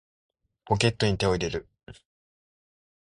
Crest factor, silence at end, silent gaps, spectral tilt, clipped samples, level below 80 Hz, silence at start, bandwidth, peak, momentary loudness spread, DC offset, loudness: 22 dB; 1.2 s; none; -5 dB/octave; under 0.1%; -48 dBFS; 0.65 s; 11.5 kHz; -8 dBFS; 8 LU; under 0.1%; -26 LUFS